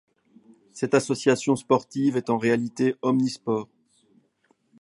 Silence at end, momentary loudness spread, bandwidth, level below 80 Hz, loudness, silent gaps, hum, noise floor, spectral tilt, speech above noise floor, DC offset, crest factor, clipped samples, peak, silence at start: 1.2 s; 7 LU; 11.5 kHz; -70 dBFS; -24 LUFS; none; none; -67 dBFS; -5.5 dB/octave; 44 dB; under 0.1%; 20 dB; under 0.1%; -6 dBFS; 0.75 s